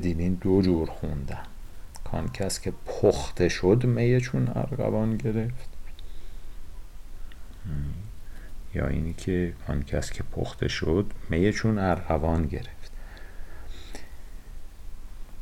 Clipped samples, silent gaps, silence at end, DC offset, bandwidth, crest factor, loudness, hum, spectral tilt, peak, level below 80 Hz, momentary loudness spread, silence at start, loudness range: under 0.1%; none; 0 s; under 0.1%; 15.5 kHz; 18 dB; -27 LUFS; none; -6.5 dB/octave; -8 dBFS; -38 dBFS; 24 LU; 0 s; 11 LU